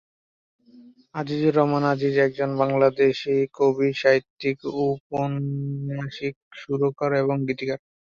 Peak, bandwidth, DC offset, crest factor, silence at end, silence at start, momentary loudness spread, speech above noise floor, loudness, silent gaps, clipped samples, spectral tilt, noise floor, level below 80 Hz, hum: -6 dBFS; 7 kHz; under 0.1%; 18 dB; 0.4 s; 0.75 s; 11 LU; 28 dB; -23 LUFS; 4.30-4.37 s, 5.00-5.10 s, 6.36-6.51 s; under 0.1%; -7.5 dB/octave; -51 dBFS; -62 dBFS; none